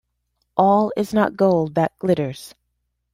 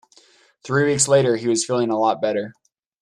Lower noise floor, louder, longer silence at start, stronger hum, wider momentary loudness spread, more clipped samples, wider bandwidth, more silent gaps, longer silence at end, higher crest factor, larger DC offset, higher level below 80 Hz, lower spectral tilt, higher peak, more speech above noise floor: first, -74 dBFS vs -55 dBFS; about the same, -20 LUFS vs -19 LUFS; about the same, 0.55 s vs 0.65 s; first, 60 Hz at -55 dBFS vs none; about the same, 10 LU vs 8 LU; neither; first, 16 kHz vs 13 kHz; neither; first, 0.65 s vs 0.5 s; about the same, 18 dB vs 16 dB; neither; about the same, -58 dBFS vs -62 dBFS; first, -7.5 dB/octave vs -4 dB/octave; about the same, -2 dBFS vs -4 dBFS; first, 55 dB vs 36 dB